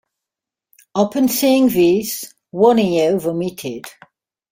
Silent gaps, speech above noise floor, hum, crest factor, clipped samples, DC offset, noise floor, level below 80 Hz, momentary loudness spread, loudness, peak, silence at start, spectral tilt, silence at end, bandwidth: none; 70 dB; none; 16 dB; under 0.1%; under 0.1%; -86 dBFS; -58 dBFS; 15 LU; -16 LUFS; -2 dBFS; 0.95 s; -5 dB/octave; 0.6 s; 16.5 kHz